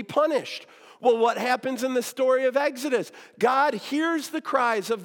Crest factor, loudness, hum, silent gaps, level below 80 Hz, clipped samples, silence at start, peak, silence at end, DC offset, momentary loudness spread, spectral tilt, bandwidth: 16 dB; -24 LUFS; none; none; -90 dBFS; under 0.1%; 0 s; -8 dBFS; 0 s; under 0.1%; 7 LU; -3.5 dB/octave; 18 kHz